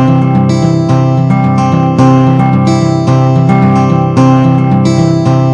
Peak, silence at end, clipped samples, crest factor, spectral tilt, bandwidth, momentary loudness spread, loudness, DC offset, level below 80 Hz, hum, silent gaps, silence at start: 0 dBFS; 0 s; under 0.1%; 8 dB; -8 dB/octave; 8.4 kHz; 2 LU; -8 LUFS; under 0.1%; -40 dBFS; none; none; 0 s